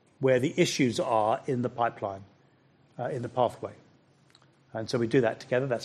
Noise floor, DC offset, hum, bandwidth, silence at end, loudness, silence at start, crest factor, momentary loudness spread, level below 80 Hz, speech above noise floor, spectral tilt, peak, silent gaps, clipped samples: -63 dBFS; under 0.1%; none; 13 kHz; 0 s; -28 LUFS; 0.2 s; 18 dB; 13 LU; -70 dBFS; 35 dB; -5.5 dB/octave; -10 dBFS; none; under 0.1%